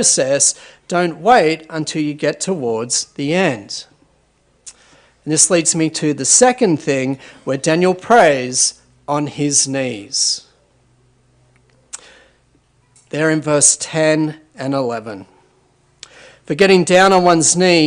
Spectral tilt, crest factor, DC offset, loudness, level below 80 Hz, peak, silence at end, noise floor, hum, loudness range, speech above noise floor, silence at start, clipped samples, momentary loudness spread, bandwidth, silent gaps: -3 dB/octave; 16 dB; under 0.1%; -14 LUFS; -58 dBFS; 0 dBFS; 0 s; -58 dBFS; none; 7 LU; 43 dB; 0 s; under 0.1%; 16 LU; 13.5 kHz; none